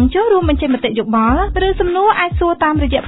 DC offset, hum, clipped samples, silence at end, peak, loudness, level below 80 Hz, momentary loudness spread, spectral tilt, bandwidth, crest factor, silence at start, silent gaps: under 0.1%; none; under 0.1%; 0 s; -2 dBFS; -14 LUFS; -24 dBFS; 3 LU; -10.5 dB/octave; 4.1 kHz; 12 dB; 0 s; none